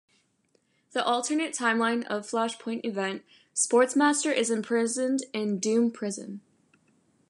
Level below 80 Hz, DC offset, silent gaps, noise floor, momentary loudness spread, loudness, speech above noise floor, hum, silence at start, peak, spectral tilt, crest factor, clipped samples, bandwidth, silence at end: -82 dBFS; under 0.1%; none; -70 dBFS; 11 LU; -27 LUFS; 43 dB; none; 0.95 s; -10 dBFS; -3 dB/octave; 20 dB; under 0.1%; 11.5 kHz; 0.9 s